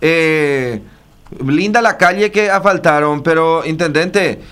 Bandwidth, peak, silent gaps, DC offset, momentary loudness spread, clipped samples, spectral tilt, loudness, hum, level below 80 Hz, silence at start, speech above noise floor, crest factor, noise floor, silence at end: 15 kHz; 0 dBFS; none; under 0.1%; 6 LU; under 0.1%; -5.5 dB/octave; -13 LUFS; none; -46 dBFS; 0 s; 28 dB; 14 dB; -41 dBFS; 0 s